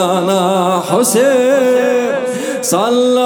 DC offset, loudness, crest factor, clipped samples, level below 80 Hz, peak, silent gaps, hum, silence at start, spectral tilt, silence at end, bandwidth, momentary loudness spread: under 0.1%; -13 LUFS; 12 dB; under 0.1%; -66 dBFS; 0 dBFS; none; none; 0 s; -4 dB/octave; 0 s; over 20 kHz; 6 LU